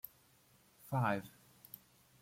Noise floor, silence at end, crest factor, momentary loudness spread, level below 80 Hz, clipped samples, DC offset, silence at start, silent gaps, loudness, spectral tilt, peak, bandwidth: -69 dBFS; 0.9 s; 20 dB; 24 LU; -76 dBFS; under 0.1%; under 0.1%; 0.85 s; none; -38 LUFS; -7 dB/octave; -22 dBFS; 16.5 kHz